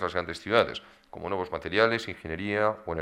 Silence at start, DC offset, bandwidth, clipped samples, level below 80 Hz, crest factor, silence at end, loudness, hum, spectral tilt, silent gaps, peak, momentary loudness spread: 0 s; under 0.1%; 12.5 kHz; under 0.1%; -54 dBFS; 24 dB; 0 s; -28 LUFS; none; -5.5 dB/octave; none; -6 dBFS; 13 LU